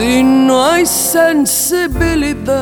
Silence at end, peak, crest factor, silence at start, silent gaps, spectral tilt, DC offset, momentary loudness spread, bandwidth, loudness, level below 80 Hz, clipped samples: 0 s; 0 dBFS; 12 dB; 0 s; none; -3.5 dB/octave; under 0.1%; 5 LU; 20 kHz; -11 LUFS; -28 dBFS; under 0.1%